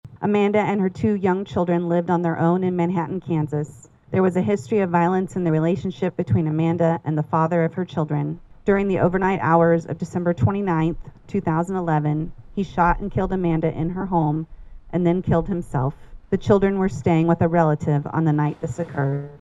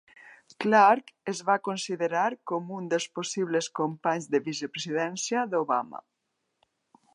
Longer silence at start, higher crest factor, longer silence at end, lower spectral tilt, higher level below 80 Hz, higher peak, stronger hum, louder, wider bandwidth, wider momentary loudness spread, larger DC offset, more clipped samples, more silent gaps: second, 0.05 s vs 0.25 s; about the same, 18 dB vs 20 dB; second, 0.05 s vs 1.2 s; first, -8.5 dB/octave vs -4 dB/octave; first, -42 dBFS vs -84 dBFS; first, -2 dBFS vs -8 dBFS; neither; first, -22 LUFS vs -27 LUFS; second, 7.8 kHz vs 11.5 kHz; second, 8 LU vs 12 LU; neither; neither; neither